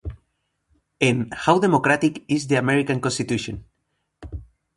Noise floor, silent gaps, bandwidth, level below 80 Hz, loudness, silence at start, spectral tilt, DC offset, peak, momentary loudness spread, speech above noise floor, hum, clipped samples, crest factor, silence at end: -74 dBFS; none; 11.5 kHz; -46 dBFS; -21 LUFS; 0.05 s; -5.5 dB/octave; under 0.1%; 0 dBFS; 21 LU; 54 dB; none; under 0.1%; 22 dB; 0.3 s